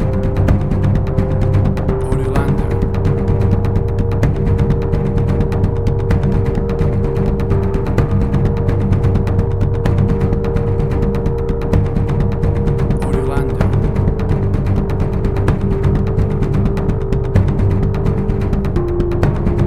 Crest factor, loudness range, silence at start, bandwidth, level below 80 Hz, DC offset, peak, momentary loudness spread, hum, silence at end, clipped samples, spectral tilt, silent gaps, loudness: 14 dB; 1 LU; 0 s; 9.2 kHz; -20 dBFS; under 0.1%; 0 dBFS; 3 LU; none; 0 s; under 0.1%; -9.5 dB/octave; none; -16 LUFS